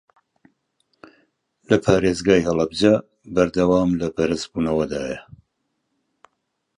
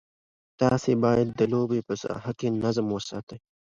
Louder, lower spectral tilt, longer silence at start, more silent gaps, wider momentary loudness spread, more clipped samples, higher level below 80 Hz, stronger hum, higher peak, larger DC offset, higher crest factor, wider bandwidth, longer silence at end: first, -20 LUFS vs -26 LUFS; about the same, -6 dB/octave vs -7 dB/octave; first, 1.7 s vs 0.6 s; second, none vs 3.23-3.27 s; about the same, 8 LU vs 10 LU; neither; first, -46 dBFS vs -58 dBFS; neither; first, 0 dBFS vs -8 dBFS; neither; about the same, 22 dB vs 18 dB; first, 11 kHz vs 7.6 kHz; first, 1.6 s vs 0.3 s